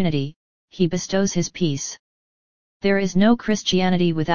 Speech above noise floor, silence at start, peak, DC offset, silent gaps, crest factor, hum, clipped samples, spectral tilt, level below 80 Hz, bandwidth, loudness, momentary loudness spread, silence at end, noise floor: over 70 dB; 0 s; -4 dBFS; 2%; 0.36-0.68 s, 1.99-2.80 s; 16 dB; none; under 0.1%; -5 dB/octave; -48 dBFS; 7.2 kHz; -21 LUFS; 10 LU; 0 s; under -90 dBFS